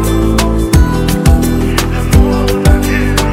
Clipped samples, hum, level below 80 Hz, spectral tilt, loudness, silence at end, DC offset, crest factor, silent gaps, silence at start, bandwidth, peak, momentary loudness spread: 2%; none; -14 dBFS; -6 dB/octave; -11 LUFS; 0 s; under 0.1%; 10 dB; none; 0 s; 16.5 kHz; 0 dBFS; 2 LU